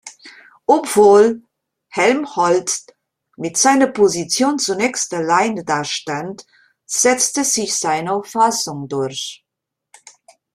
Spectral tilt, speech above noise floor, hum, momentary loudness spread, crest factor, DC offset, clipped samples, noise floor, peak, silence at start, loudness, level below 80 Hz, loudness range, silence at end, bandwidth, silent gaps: -2.5 dB/octave; 65 dB; none; 13 LU; 16 dB; under 0.1%; under 0.1%; -81 dBFS; -2 dBFS; 0.05 s; -16 LUFS; -62 dBFS; 2 LU; 1.2 s; 15.5 kHz; none